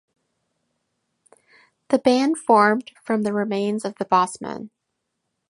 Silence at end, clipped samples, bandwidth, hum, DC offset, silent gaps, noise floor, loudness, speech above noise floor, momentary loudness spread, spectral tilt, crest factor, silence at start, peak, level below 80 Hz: 0.85 s; under 0.1%; 11.5 kHz; none; under 0.1%; none; -78 dBFS; -21 LUFS; 58 dB; 11 LU; -5 dB/octave; 20 dB; 1.9 s; -2 dBFS; -70 dBFS